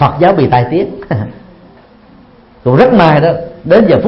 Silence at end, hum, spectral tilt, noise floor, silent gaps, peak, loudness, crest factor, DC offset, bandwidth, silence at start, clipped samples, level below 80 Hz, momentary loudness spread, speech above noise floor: 0 s; none; -9.5 dB/octave; -40 dBFS; none; 0 dBFS; -10 LUFS; 10 dB; under 0.1%; 5.8 kHz; 0 s; 0.4%; -38 dBFS; 12 LU; 32 dB